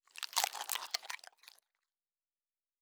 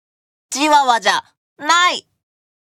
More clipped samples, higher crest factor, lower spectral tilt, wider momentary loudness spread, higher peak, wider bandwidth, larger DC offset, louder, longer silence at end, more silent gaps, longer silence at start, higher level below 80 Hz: neither; first, 32 dB vs 16 dB; second, 5 dB/octave vs 0 dB/octave; about the same, 12 LU vs 13 LU; second, -12 dBFS vs -2 dBFS; first, over 20 kHz vs 16 kHz; neither; second, -38 LUFS vs -15 LUFS; first, 1.65 s vs 0.75 s; second, none vs 1.37-1.56 s; second, 0.15 s vs 0.5 s; second, under -90 dBFS vs -66 dBFS